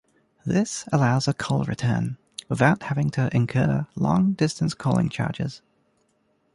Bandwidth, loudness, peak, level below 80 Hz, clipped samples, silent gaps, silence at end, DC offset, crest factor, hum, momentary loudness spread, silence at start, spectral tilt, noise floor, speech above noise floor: 11.5 kHz; -24 LUFS; -4 dBFS; -52 dBFS; under 0.1%; none; 1 s; under 0.1%; 20 dB; none; 9 LU; 0.45 s; -6.5 dB/octave; -68 dBFS; 45 dB